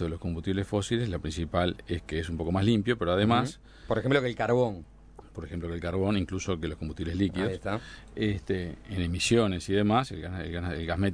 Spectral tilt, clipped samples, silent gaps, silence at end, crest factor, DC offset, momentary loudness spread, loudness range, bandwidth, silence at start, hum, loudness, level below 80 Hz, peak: -6 dB/octave; under 0.1%; none; 0 s; 20 dB; under 0.1%; 11 LU; 4 LU; 11 kHz; 0 s; none; -29 LUFS; -46 dBFS; -10 dBFS